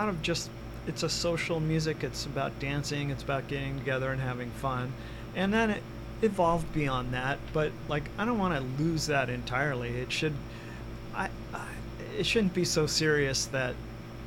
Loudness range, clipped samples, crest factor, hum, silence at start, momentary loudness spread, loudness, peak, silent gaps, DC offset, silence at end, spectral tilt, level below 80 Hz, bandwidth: 3 LU; under 0.1%; 18 dB; 60 Hz at -45 dBFS; 0 s; 12 LU; -31 LUFS; -14 dBFS; none; under 0.1%; 0 s; -4.5 dB/octave; -46 dBFS; 19 kHz